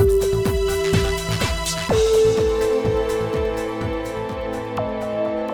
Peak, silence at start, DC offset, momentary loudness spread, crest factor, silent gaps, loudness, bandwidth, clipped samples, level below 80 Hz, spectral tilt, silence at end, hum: -4 dBFS; 0 s; under 0.1%; 9 LU; 16 dB; none; -21 LUFS; 20 kHz; under 0.1%; -32 dBFS; -5 dB/octave; 0 s; none